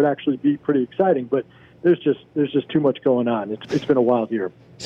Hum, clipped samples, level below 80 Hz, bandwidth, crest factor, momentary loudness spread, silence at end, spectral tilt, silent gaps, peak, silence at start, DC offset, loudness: none; under 0.1%; -64 dBFS; 7.2 kHz; 14 dB; 7 LU; 0 s; -7.5 dB/octave; none; -6 dBFS; 0 s; under 0.1%; -21 LUFS